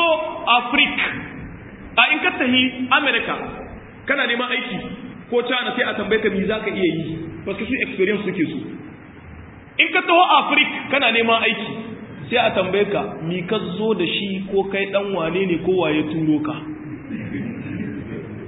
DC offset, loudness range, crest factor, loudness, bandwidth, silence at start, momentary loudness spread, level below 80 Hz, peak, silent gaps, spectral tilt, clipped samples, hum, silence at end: under 0.1%; 5 LU; 20 dB; -19 LUFS; 4 kHz; 0 s; 17 LU; -50 dBFS; 0 dBFS; none; -10 dB/octave; under 0.1%; none; 0 s